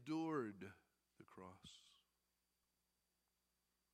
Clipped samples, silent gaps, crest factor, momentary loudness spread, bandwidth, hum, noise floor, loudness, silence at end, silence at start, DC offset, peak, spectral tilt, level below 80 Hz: under 0.1%; none; 20 dB; 20 LU; 13 kHz; 60 Hz at -90 dBFS; -88 dBFS; -49 LUFS; 2.05 s; 0 s; under 0.1%; -32 dBFS; -6 dB/octave; -90 dBFS